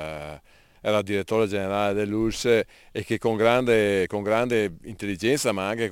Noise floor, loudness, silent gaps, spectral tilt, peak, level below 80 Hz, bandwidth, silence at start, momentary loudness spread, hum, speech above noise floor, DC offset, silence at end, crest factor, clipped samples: -49 dBFS; -24 LUFS; none; -5 dB/octave; -6 dBFS; -50 dBFS; 17 kHz; 0 s; 12 LU; none; 26 dB; under 0.1%; 0 s; 18 dB; under 0.1%